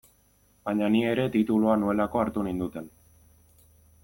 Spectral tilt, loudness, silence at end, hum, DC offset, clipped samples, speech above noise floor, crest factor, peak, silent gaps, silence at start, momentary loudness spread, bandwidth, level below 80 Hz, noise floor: -7.5 dB/octave; -26 LUFS; 1.15 s; none; under 0.1%; under 0.1%; 38 dB; 18 dB; -10 dBFS; none; 0.65 s; 14 LU; 17 kHz; -56 dBFS; -63 dBFS